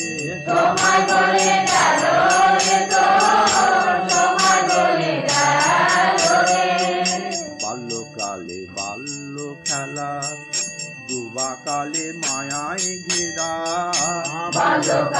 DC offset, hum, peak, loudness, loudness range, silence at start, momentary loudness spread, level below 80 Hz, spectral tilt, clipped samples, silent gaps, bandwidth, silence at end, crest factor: under 0.1%; none; -6 dBFS; -18 LUFS; 11 LU; 0 s; 13 LU; -60 dBFS; -2 dB/octave; under 0.1%; none; 12.5 kHz; 0 s; 14 dB